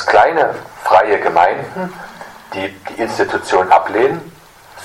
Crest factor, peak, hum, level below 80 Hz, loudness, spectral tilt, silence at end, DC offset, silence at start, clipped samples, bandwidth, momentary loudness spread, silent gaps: 16 dB; 0 dBFS; none; -52 dBFS; -15 LUFS; -4.5 dB/octave; 0 s; under 0.1%; 0 s; under 0.1%; 16 kHz; 15 LU; none